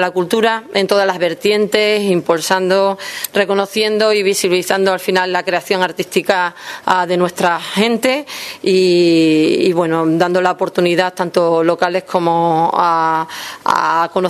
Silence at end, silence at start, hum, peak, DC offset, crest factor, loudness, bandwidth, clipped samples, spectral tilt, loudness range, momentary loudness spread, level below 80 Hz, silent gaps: 0 s; 0 s; none; 0 dBFS; under 0.1%; 14 dB; -15 LUFS; 14 kHz; under 0.1%; -4.5 dB/octave; 2 LU; 5 LU; -62 dBFS; none